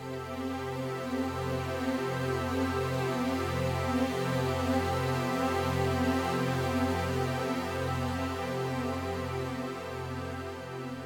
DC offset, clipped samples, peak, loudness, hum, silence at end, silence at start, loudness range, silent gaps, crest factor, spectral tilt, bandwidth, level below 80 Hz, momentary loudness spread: under 0.1%; under 0.1%; -14 dBFS; -32 LUFS; none; 0 s; 0 s; 4 LU; none; 16 dB; -6 dB/octave; over 20 kHz; -52 dBFS; 8 LU